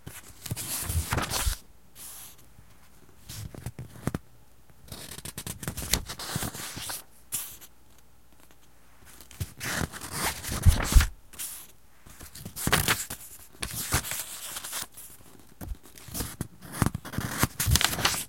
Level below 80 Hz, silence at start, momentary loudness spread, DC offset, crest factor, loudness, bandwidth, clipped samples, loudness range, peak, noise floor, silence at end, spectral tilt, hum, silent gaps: -36 dBFS; 0.05 s; 20 LU; 0.3%; 30 dB; -30 LUFS; 17 kHz; under 0.1%; 11 LU; -2 dBFS; -59 dBFS; 0 s; -3 dB/octave; none; none